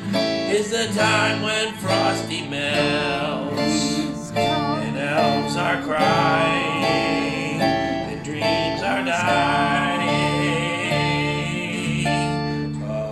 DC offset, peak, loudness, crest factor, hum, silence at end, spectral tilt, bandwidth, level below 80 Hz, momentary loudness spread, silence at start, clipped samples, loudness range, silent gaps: under 0.1%; -6 dBFS; -21 LUFS; 16 dB; none; 0 s; -4.5 dB/octave; 14 kHz; -46 dBFS; 6 LU; 0 s; under 0.1%; 2 LU; none